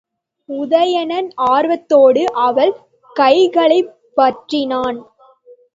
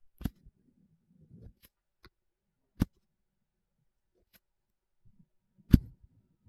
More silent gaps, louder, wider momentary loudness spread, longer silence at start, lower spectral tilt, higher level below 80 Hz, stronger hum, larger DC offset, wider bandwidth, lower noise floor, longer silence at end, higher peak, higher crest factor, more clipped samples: neither; first, -14 LUFS vs -31 LUFS; second, 12 LU vs 29 LU; first, 0.5 s vs 0.25 s; second, -4.5 dB/octave vs -8.5 dB/octave; second, -62 dBFS vs -44 dBFS; neither; neither; second, 7.6 kHz vs 15 kHz; second, -46 dBFS vs -82 dBFS; about the same, 0.75 s vs 0.7 s; first, 0 dBFS vs -4 dBFS; second, 14 dB vs 34 dB; neither